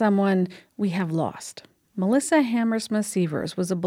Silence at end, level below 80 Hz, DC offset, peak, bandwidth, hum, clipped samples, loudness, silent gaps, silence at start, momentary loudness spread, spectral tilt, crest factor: 0 s; -68 dBFS; under 0.1%; -10 dBFS; 15.5 kHz; none; under 0.1%; -24 LUFS; none; 0 s; 10 LU; -6 dB/octave; 14 dB